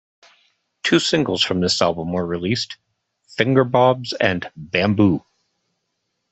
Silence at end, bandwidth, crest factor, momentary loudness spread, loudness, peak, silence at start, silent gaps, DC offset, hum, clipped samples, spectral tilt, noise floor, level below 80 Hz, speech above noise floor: 1.15 s; 8.4 kHz; 20 dB; 10 LU; -19 LUFS; -2 dBFS; 0.85 s; none; under 0.1%; none; under 0.1%; -5 dB/octave; -74 dBFS; -56 dBFS; 56 dB